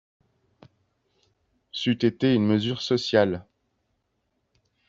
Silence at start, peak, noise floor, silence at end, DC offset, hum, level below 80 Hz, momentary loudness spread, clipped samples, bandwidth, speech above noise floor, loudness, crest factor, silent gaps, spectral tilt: 1.75 s; -6 dBFS; -75 dBFS; 1.45 s; under 0.1%; none; -64 dBFS; 8 LU; under 0.1%; 7.8 kHz; 52 dB; -24 LUFS; 22 dB; none; -6.5 dB/octave